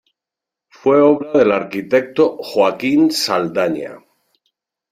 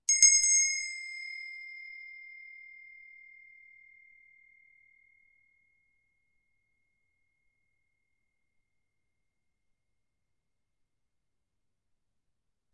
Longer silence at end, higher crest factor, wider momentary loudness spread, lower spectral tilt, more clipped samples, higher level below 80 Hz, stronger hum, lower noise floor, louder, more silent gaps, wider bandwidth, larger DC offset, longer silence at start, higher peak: second, 0.95 s vs 10.25 s; second, 16 dB vs 28 dB; second, 8 LU vs 29 LU; first, -5 dB/octave vs 6 dB/octave; neither; first, -60 dBFS vs -78 dBFS; neither; about the same, -86 dBFS vs -85 dBFS; first, -16 LUFS vs -24 LUFS; neither; first, 15.5 kHz vs 11.5 kHz; neither; first, 0.85 s vs 0.1 s; first, -2 dBFS vs -8 dBFS